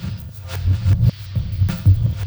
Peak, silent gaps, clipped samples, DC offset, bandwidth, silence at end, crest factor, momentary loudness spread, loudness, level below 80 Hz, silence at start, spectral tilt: -4 dBFS; none; under 0.1%; under 0.1%; over 20 kHz; 0 s; 14 dB; 13 LU; -19 LUFS; -28 dBFS; 0 s; -7.5 dB/octave